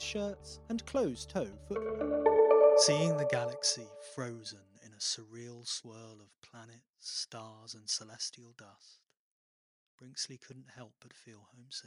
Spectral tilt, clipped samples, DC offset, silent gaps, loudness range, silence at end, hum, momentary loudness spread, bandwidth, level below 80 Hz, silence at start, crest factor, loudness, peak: -3.5 dB/octave; under 0.1%; under 0.1%; 6.38-6.42 s, 6.89-6.94 s, 9.19-9.98 s; 15 LU; 0.05 s; none; 23 LU; 11.5 kHz; -64 dBFS; 0 s; 20 dB; -32 LUFS; -14 dBFS